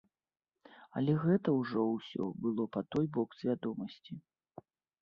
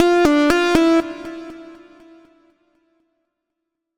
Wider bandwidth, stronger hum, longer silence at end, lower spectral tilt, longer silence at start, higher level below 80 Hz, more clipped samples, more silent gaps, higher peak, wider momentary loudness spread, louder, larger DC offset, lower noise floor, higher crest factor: second, 6.8 kHz vs 16 kHz; neither; second, 0.85 s vs 2.25 s; first, -9.5 dB/octave vs -4.5 dB/octave; first, 0.7 s vs 0 s; second, -74 dBFS vs -46 dBFS; neither; neither; second, -18 dBFS vs 0 dBFS; second, 14 LU vs 21 LU; second, -35 LUFS vs -15 LUFS; neither; second, -60 dBFS vs -79 dBFS; about the same, 18 dB vs 20 dB